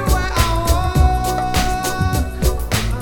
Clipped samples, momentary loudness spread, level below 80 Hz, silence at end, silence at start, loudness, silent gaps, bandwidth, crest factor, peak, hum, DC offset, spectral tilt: under 0.1%; 4 LU; -20 dBFS; 0 s; 0 s; -18 LUFS; none; 19 kHz; 16 dB; -2 dBFS; none; under 0.1%; -4.5 dB/octave